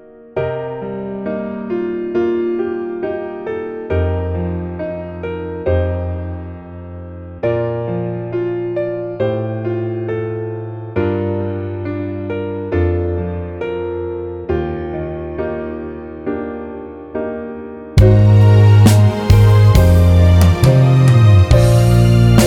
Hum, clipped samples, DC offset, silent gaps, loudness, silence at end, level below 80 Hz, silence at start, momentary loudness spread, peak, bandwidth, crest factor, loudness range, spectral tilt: none; under 0.1%; under 0.1%; none; -15 LUFS; 0 s; -26 dBFS; 0.35 s; 16 LU; 0 dBFS; 15 kHz; 14 dB; 13 LU; -7.5 dB/octave